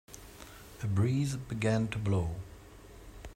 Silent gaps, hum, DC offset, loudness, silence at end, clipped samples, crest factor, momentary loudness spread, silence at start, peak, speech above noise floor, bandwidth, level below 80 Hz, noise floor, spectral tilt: none; none; under 0.1%; -32 LUFS; 0 s; under 0.1%; 16 dB; 22 LU; 0.1 s; -16 dBFS; 21 dB; 16 kHz; -52 dBFS; -52 dBFS; -6.5 dB/octave